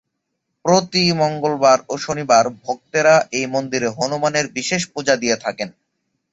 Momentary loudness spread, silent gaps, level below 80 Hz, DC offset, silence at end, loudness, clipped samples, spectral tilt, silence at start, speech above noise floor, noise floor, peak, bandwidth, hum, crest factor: 10 LU; none; -58 dBFS; under 0.1%; 0.65 s; -18 LUFS; under 0.1%; -3.5 dB/octave; 0.65 s; 58 dB; -75 dBFS; -2 dBFS; 8.2 kHz; none; 18 dB